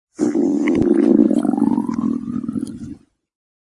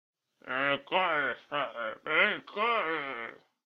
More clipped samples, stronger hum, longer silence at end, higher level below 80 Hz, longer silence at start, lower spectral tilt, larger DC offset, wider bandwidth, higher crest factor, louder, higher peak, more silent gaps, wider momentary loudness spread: neither; neither; first, 0.7 s vs 0.3 s; first, -50 dBFS vs -76 dBFS; second, 0.2 s vs 0.45 s; first, -8 dB/octave vs -5.5 dB/octave; neither; first, 11.5 kHz vs 6.6 kHz; about the same, 18 dB vs 22 dB; first, -18 LUFS vs -30 LUFS; first, 0 dBFS vs -10 dBFS; neither; first, 14 LU vs 11 LU